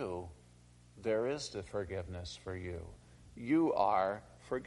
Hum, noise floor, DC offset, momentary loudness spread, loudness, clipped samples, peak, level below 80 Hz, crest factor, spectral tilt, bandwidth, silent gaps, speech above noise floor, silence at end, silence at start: 60 Hz at -60 dBFS; -61 dBFS; under 0.1%; 16 LU; -36 LUFS; under 0.1%; -18 dBFS; -62 dBFS; 20 dB; -6 dB/octave; 11.5 kHz; none; 25 dB; 0 s; 0 s